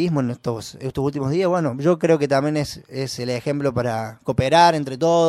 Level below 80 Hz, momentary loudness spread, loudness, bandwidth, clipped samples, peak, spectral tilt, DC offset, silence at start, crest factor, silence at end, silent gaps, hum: -50 dBFS; 12 LU; -21 LUFS; 15 kHz; under 0.1%; -2 dBFS; -6 dB/octave; under 0.1%; 0 s; 18 dB; 0 s; none; none